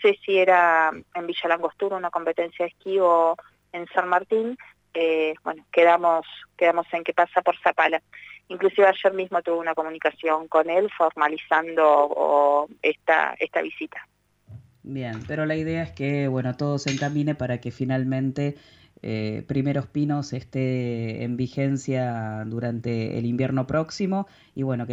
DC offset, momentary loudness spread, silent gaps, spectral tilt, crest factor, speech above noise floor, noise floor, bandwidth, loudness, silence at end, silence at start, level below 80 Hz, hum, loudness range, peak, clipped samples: under 0.1%; 12 LU; none; -6.5 dB/octave; 18 dB; 24 dB; -47 dBFS; 8 kHz; -23 LUFS; 0 s; 0 s; -60 dBFS; 50 Hz at -60 dBFS; 6 LU; -6 dBFS; under 0.1%